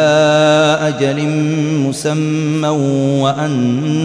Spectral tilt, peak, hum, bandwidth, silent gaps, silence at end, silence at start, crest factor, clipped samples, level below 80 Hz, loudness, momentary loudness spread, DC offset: -6 dB/octave; -2 dBFS; none; 11 kHz; none; 0 s; 0 s; 10 dB; under 0.1%; -54 dBFS; -14 LUFS; 6 LU; under 0.1%